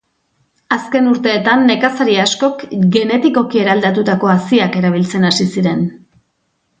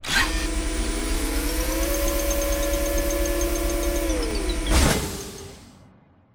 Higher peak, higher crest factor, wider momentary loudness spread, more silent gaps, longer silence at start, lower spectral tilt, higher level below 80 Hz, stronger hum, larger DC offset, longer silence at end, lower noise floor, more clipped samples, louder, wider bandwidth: first, 0 dBFS vs -6 dBFS; about the same, 14 dB vs 18 dB; about the same, 5 LU vs 6 LU; neither; first, 0.7 s vs 0 s; first, -5.5 dB/octave vs -3.5 dB/octave; second, -56 dBFS vs -28 dBFS; neither; second, under 0.1% vs 0.1%; first, 0.85 s vs 0.65 s; first, -65 dBFS vs -54 dBFS; neither; first, -13 LUFS vs -24 LUFS; second, 9.2 kHz vs over 20 kHz